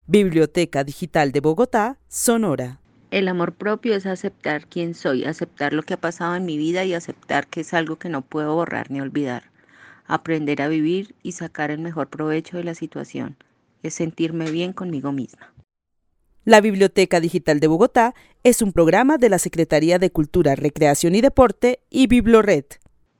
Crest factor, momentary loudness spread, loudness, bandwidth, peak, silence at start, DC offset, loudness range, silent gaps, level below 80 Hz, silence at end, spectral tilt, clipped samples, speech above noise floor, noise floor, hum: 20 dB; 13 LU; -20 LUFS; 17.5 kHz; 0 dBFS; 0.1 s; under 0.1%; 10 LU; none; -44 dBFS; 0.45 s; -5 dB/octave; under 0.1%; 50 dB; -69 dBFS; none